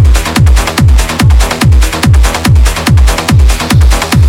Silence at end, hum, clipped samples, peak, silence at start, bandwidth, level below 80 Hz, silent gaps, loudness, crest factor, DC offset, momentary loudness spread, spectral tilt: 0 s; none; 0.2%; 0 dBFS; 0 s; 16.5 kHz; -8 dBFS; none; -8 LUFS; 6 dB; under 0.1%; 0 LU; -5 dB/octave